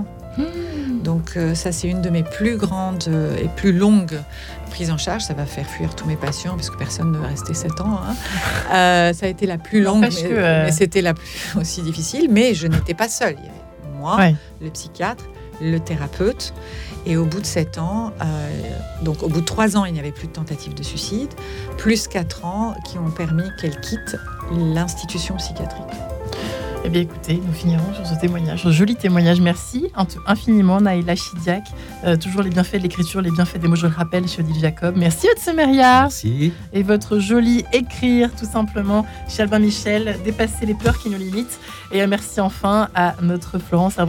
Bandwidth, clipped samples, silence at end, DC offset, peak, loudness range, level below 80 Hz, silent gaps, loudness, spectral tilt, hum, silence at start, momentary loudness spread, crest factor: 17.5 kHz; under 0.1%; 0 s; under 0.1%; -2 dBFS; 7 LU; -36 dBFS; none; -19 LUFS; -5.5 dB/octave; none; 0 s; 12 LU; 16 dB